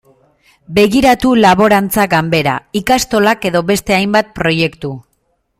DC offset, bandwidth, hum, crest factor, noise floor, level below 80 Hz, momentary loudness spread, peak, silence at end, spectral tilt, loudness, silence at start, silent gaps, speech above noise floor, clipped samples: under 0.1%; 16 kHz; none; 12 dB; -63 dBFS; -40 dBFS; 8 LU; 0 dBFS; 0.6 s; -5 dB/octave; -12 LUFS; 0.7 s; none; 51 dB; under 0.1%